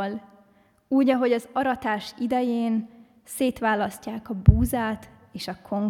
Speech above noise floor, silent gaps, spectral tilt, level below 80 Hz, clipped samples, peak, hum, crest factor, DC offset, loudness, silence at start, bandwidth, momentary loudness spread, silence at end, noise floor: 36 dB; none; -7 dB/octave; -36 dBFS; under 0.1%; 0 dBFS; none; 24 dB; under 0.1%; -24 LUFS; 0 s; 16.5 kHz; 16 LU; 0 s; -59 dBFS